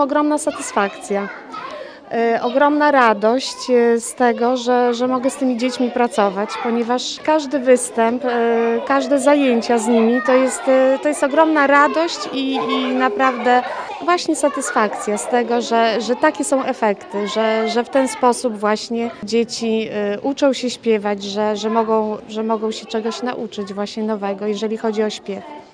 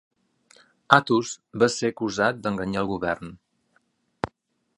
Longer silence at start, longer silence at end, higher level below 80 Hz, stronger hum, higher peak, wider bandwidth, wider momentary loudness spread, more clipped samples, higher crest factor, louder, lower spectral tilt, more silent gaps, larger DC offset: second, 0 s vs 0.9 s; second, 0.1 s vs 0.5 s; second, -62 dBFS vs -56 dBFS; neither; about the same, 0 dBFS vs 0 dBFS; about the same, 10.5 kHz vs 11.5 kHz; second, 9 LU vs 15 LU; neither; second, 18 dB vs 26 dB; first, -18 LUFS vs -24 LUFS; about the same, -3.5 dB/octave vs -4.5 dB/octave; neither; neither